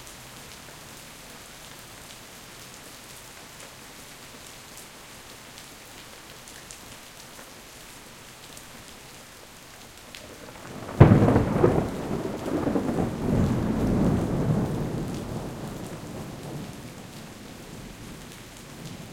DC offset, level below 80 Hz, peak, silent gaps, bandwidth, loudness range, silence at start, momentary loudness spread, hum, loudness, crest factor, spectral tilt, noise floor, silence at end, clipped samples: under 0.1%; -44 dBFS; 0 dBFS; none; 17 kHz; 19 LU; 0 s; 20 LU; none; -25 LUFS; 28 dB; -7 dB/octave; -46 dBFS; 0 s; under 0.1%